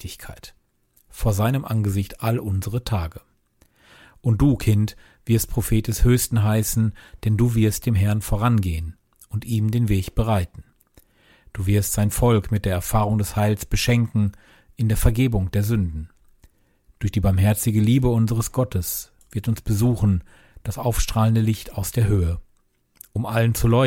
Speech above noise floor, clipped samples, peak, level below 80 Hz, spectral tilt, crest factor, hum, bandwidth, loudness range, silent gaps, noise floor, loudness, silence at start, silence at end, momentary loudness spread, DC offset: 42 dB; under 0.1%; -4 dBFS; -34 dBFS; -6 dB/octave; 18 dB; none; 17 kHz; 4 LU; none; -62 dBFS; -22 LUFS; 0 s; 0 s; 10 LU; under 0.1%